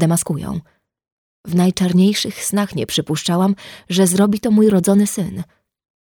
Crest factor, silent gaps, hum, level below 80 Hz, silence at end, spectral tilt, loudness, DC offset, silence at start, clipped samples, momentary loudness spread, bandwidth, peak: 16 dB; 1.12-1.44 s; none; -50 dBFS; 0.75 s; -5.5 dB/octave; -17 LUFS; under 0.1%; 0 s; under 0.1%; 13 LU; 19.5 kHz; -2 dBFS